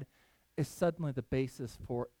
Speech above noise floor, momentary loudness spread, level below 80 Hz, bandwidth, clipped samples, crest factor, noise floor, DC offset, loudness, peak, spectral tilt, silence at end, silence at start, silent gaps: 34 dB; 12 LU; -58 dBFS; 18 kHz; under 0.1%; 18 dB; -70 dBFS; under 0.1%; -37 LUFS; -20 dBFS; -7 dB/octave; 0.15 s; 0 s; none